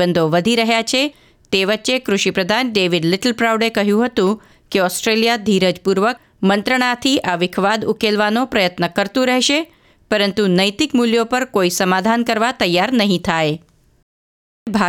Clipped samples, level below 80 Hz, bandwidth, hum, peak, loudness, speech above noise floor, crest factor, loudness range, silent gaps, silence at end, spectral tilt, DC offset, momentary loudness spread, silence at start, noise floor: under 0.1%; -52 dBFS; 18.5 kHz; none; -2 dBFS; -16 LUFS; over 74 dB; 16 dB; 1 LU; 14.03-14.66 s; 0 s; -4 dB/octave; under 0.1%; 4 LU; 0 s; under -90 dBFS